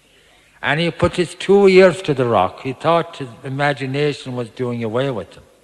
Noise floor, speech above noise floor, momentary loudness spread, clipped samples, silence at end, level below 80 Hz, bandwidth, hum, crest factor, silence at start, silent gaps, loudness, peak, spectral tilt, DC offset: -52 dBFS; 35 dB; 16 LU; under 0.1%; 0.4 s; -48 dBFS; 11 kHz; none; 18 dB; 0.6 s; none; -17 LUFS; 0 dBFS; -6 dB/octave; under 0.1%